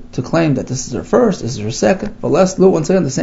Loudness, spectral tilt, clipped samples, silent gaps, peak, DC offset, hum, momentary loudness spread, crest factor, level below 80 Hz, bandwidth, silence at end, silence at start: -15 LUFS; -6 dB/octave; under 0.1%; none; 0 dBFS; under 0.1%; none; 10 LU; 14 dB; -38 dBFS; 8 kHz; 0 s; 0 s